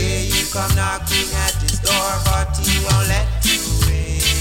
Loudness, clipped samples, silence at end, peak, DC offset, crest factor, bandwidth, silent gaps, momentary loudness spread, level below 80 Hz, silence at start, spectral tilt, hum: -17 LUFS; under 0.1%; 0 s; -2 dBFS; under 0.1%; 14 dB; 17 kHz; none; 2 LU; -22 dBFS; 0 s; -3 dB/octave; none